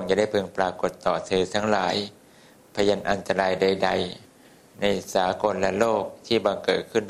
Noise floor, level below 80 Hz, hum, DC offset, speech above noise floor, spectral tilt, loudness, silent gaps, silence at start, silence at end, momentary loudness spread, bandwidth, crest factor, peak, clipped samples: -53 dBFS; -54 dBFS; none; under 0.1%; 29 dB; -4.5 dB/octave; -24 LUFS; none; 0 s; 0 s; 6 LU; 14.5 kHz; 20 dB; -4 dBFS; under 0.1%